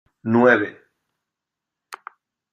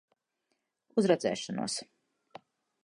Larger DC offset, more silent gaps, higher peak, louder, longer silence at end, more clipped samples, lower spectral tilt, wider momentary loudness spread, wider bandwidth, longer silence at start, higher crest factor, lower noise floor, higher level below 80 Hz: neither; neither; first, -2 dBFS vs -12 dBFS; first, -18 LUFS vs -31 LUFS; second, 0.55 s vs 1 s; neither; first, -7.5 dB/octave vs -4.5 dB/octave; first, 24 LU vs 8 LU; first, 14 kHz vs 11 kHz; second, 0.25 s vs 0.95 s; about the same, 20 dB vs 24 dB; first, -85 dBFS vs -81 dBFS; first, -68 dBFS vs -80 dBFS